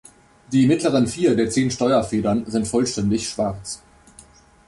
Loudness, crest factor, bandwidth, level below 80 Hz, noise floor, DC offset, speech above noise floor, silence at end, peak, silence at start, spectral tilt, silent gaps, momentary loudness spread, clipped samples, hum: -20 LUFS; 14 dB; 11.5 kHz; -48 dBFS; -49 dBFS; under 0.1%; 30 dB; 0.9 s; -6 dBFS; 0.5 s; -5.5 dB/octave; none; 8 LU; under 0.1%; none